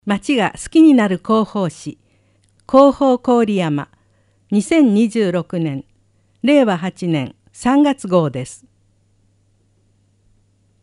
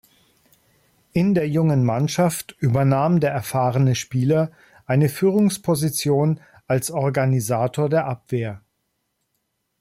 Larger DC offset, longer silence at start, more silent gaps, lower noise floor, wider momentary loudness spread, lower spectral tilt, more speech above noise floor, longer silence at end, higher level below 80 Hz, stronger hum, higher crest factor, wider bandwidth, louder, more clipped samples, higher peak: neither; second, 0.05 s vs 1.15 s; neither; second, -58 dBFS vs -74 dBFS; first, 13 LU vs 8 LU; about the same, -6.5 dB/octave vs -6.5 dB/octave; second, 44 dB vs 54 dB; first, 2.25 s vs 1.2 s; about the same, -52 dBFS vs -56 dBFS; neither; first, 18 dB vs 12 dB; second, 11.5 kHz vs 16 kHz; first, -16 LUFS vs -21 LUFS; neither; first, 0 dBFS vs -8 dBFS